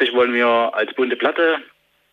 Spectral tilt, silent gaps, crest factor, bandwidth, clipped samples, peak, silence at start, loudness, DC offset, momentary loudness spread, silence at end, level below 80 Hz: -5 dB/octave; none; 14 dB; 5.4 kHz; under 0.1%; -4 dBFS; 0 s; -18 LUFS; under 0.1%; 5 LU; 0.5 s; -72 dBFS